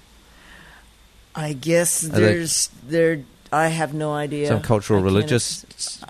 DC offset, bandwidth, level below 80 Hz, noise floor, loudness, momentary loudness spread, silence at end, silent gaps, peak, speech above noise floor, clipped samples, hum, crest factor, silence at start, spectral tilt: under 0.1%; 13.5 kHz; -50 dBFS; -51 dBFS; -21 LUFS; 10 LU; 0.05 s; none; -4 dBFS; 30 dB; under 0.1%; none; 18 dB; 0.5 s; -4.5 dB/octave